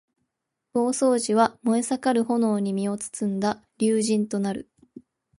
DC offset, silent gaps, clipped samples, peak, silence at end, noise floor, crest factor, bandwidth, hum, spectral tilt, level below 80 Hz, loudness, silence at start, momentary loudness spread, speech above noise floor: under 0.1%; none; under 0.1%; -6 dBFS; 0.4 s; -81 dBFS; 18 dB; 11.5 kHz; none; -5 dB/octave; -68 dBFS; -24 LUFS; 0.75 s; 7 LU; 58 dB